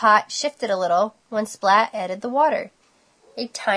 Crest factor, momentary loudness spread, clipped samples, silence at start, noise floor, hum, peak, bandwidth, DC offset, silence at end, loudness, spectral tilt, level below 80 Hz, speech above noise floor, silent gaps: 20 dB; 13 LU; under 0.1%; 0 s; -59 dBFS; none; -2 dBFS; 11 kHz; under 0.1%; 0 s; -21 LUFS; -3 dB/octave; -76 dBFS; 39 dB; none